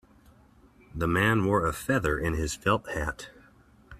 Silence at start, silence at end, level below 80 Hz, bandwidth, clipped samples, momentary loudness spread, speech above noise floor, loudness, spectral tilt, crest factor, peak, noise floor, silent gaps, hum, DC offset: 0.95 s; 0 s; -44 dBFS; 15.5 kHz; under 0.1%; 14 LU; 31 dB; -27 LUFS; -5.5 dB/octave; 20 dB; -10 dBFS; -58 dBFS; none; none; under 0.1%